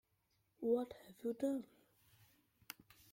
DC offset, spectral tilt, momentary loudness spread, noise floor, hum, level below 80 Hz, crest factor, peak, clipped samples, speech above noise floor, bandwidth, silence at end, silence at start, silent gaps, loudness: under 0.1%; -5.5 dB/octave; 17 LU; -81 dBFS; none; -82 dBFS; 20 dB; -26 dBFS; under 0.1%; 41 dB; 16.5 kHz; 1.45 s; 0.6 s; none; -42 LUFS